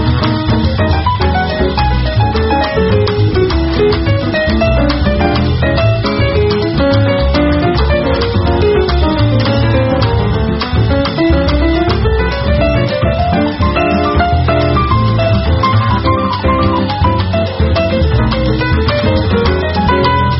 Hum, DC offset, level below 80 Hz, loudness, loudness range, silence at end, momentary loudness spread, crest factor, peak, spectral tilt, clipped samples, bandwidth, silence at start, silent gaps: none; under 0.1%; -18 dBFS; -12 LUFS; 1 LU; 0 s; 2 LU; 12 dB; 0 dBFS; -5.5 dB/octave; under 0.1%; 6 kHz; 0 s; none